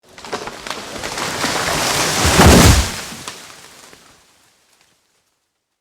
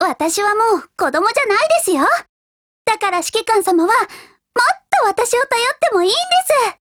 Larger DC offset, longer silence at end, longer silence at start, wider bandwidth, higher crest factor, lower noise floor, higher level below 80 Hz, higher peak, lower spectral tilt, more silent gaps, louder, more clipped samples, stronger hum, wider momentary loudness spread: neither; first, 2.3 s vs 0.1 s; first, 0.2 s vs 0 s; about the same, over 20 kHz vs over 20 kHz; about the same, 18 dB vs 16 dB; second, -70 dBFS vs under -90 dBFS; first, -26 dBFS vs -58 dBFS; about the same, 0 dBFS vs 0 dBFS; first, -4 dB/octave vs -1 dB/octave; second, none vs 2.29-2.85 s; about the same, -14 LUFS vs -15 LUFS; neither; neither; first, 21 LU vs 5 LU